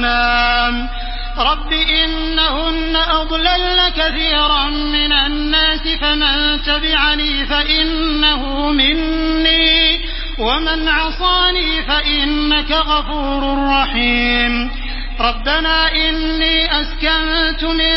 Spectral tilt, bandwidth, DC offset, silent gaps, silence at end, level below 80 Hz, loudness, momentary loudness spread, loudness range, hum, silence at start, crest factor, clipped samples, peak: -7.5 dB/octave; 5.8 kHz; under 0.1%; none; 0 s; -24 dBFS; -14 LUFS; 5 LU; 2 LU; none; 0 s; 16 dB; under 0.1%; 0 dBFS